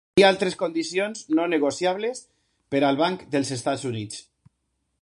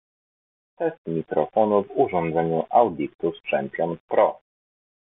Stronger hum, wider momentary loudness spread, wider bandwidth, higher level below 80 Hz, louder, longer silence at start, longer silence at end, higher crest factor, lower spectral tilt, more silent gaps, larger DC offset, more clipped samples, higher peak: neither; first, 12 LU vs 8 LU; first, 11.5 kHz vs 3.9 kHz; about the same, -64 dBFS vs -62 dBFS; about the same, -24 LUFS vs -23 LUFS; second, 0.15 s vs 0.8 s; about the same, 0.8 s vs 0.7 s; about the same, 22 dB vs 20 dB; second, -4.5 dB/octave vs -6 dB/octave; second, none vs 0.98-1.05 s, 3.15-3.19 s, 4.00-4.08 s; neither; neither; about the same, -4 dBFS vs -4 dBFS